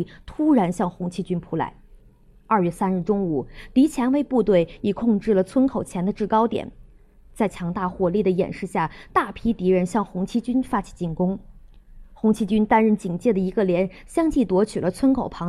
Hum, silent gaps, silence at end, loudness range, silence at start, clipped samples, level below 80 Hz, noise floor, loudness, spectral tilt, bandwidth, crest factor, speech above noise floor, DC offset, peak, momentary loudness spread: none; none; 0 s; 3 LU; 0 s; under 0.1%; -46 dBFS; -52 dBFS; -22 LUFS; -7.5 dB/octave; 13 kHz; 18 dB; 30 dB; under 0.1%; -4 dBFS; 8 LU